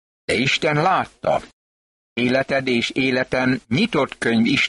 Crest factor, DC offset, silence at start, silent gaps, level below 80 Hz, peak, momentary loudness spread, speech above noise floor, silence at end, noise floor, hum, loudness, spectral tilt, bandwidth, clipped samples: 14 dB; under 0.1%; 0.3 s; 1.53-2.16 s; -52 dBFS; -6 dBFS; 5 LU; over 70 dB; 0 s; under -90 dBFS; none; -20 LUFS; -5 dB/octave; 11.5 kHz; under 0.1%